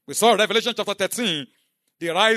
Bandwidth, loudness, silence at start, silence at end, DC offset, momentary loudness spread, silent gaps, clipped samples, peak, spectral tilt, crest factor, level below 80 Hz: 13.5 kHz; -21 LUFS; 0.1 s; 0 s; under 0.1%; 12 LU; none; under 0.1%; -4 dBFS; -2 dB/octave; 18 dB; -76 dBFS